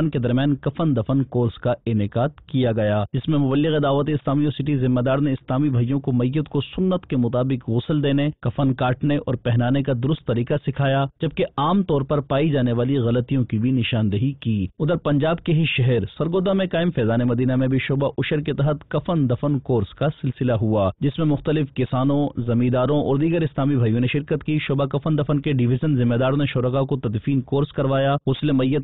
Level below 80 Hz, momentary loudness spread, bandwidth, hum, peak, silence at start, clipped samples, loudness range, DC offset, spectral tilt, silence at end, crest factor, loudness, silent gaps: -46 dBFS; 4 LU; 4.1 kHz; none; -10 dBFS; 0 s; under 0.1%; 1 LU; 0.4%; -11.5 dB/octave; 0 s; 10 dB; -21 LUFS; none